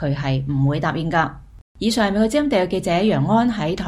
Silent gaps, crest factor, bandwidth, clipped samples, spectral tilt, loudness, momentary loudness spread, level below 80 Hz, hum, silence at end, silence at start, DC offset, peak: 1.61-1.75 s; 16 dB; 15 kHz; under 0.1%; -6.5 dB/octave; -20 LUFS; 4 LU; -42 dBFS; none; 0 s; 0 s; under 0.1%; -4 dBFS